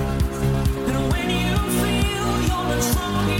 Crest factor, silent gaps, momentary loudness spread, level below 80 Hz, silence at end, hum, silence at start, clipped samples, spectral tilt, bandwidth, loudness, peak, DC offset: 14 dB; none; 2 LU; -28 dBFS; 0 s; none; 0 s; under 0.1%; -5 dB/octave; 17 kHz; -22 LUFS; -6 dBFS; under 0.1%